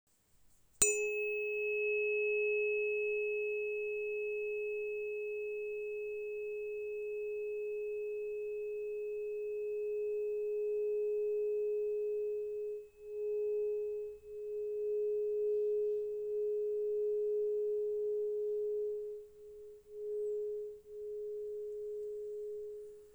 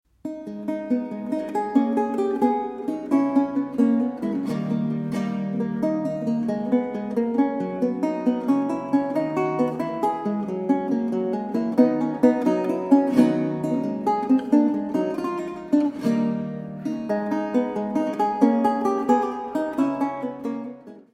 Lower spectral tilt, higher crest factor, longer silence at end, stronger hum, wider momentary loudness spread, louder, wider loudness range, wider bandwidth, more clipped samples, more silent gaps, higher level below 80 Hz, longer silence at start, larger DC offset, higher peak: second, -1.5 dB/octave vs -8 dB/octave; first, 28 dB vs 18 dB; about the same, 0 s vs 0.1 s; neither; about the same, 10 LU vs 9 LU; second, -37 LUFS vs -24 LUFS; about the same, 6 LU vs 4 LU; first, over 20 kHz vs 11.5 kHz; neither; neither; second, -74 dBFS vs -64 dBFS; first, 0.8 s vs 0.25 s; neither; second, -10 dBFS vs -4 dBFS